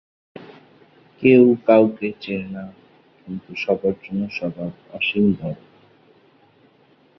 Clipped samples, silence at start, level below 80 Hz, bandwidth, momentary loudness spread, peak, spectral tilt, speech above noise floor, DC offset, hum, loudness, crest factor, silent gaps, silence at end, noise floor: under 0.1%; 0.4 s; -58 dBFS; 6 kHz; 21 LU; -2 dBFS; -8.5 dB/octave; 37 dB; under 0.1%; none; -19 LUFS; 20 dB; none; 1.65 s; -56 dBFS